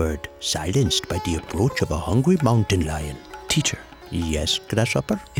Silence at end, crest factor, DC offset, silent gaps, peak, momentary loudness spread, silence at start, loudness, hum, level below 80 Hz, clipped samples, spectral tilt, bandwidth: 0 s; 18 dB; under 0.1%; none; -6 dBFS; 9 LU; 0 s; -22 LUFS; none; -36 dBFS; under 0.1%; -4.5 dB/octave; 18 kHz